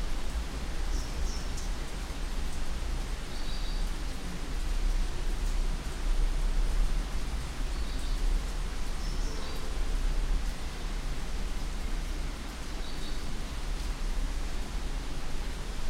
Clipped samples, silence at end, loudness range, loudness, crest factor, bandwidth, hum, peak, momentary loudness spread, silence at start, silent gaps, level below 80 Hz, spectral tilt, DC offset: under 0.1%; 0 s; 3 LU; -37 LUFS; 14 dB; 13.5 kHz; none; -16 dBFS; 5 LU; 0 s; none; -32 dBFS; -4.5 dB/octave; under 0.1%